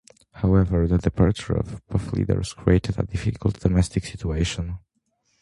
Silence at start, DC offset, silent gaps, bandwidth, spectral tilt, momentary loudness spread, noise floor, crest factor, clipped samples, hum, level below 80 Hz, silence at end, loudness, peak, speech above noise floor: 0.35 s; under 0.1%; none; 11.5 kHz; -7 dB/octave; 8 LU; -70 dBFS; 18 dB; under 0.1%; none; -32 dBFS; 0.65 s; -24 LUFS; -4 dBFS; 48 dB